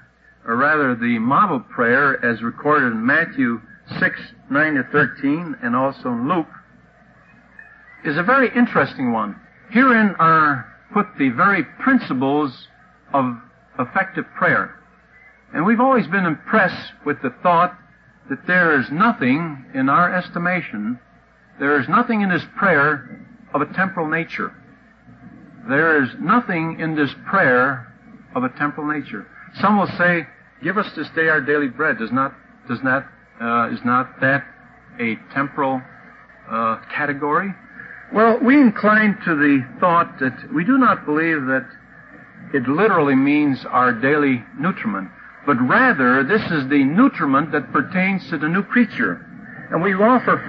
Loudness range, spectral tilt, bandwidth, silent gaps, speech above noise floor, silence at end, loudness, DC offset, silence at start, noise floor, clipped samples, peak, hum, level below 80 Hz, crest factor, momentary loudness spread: 5 LU; -9 dB/octave; 5.6 kHz; none; 33 dB; 0 s; -18 LUFS; under 0.1%; 0.45 s; -52 dBFS; under 0.1%; -4 dBFS; none; -60 dBFS; 16 dB; 12 LU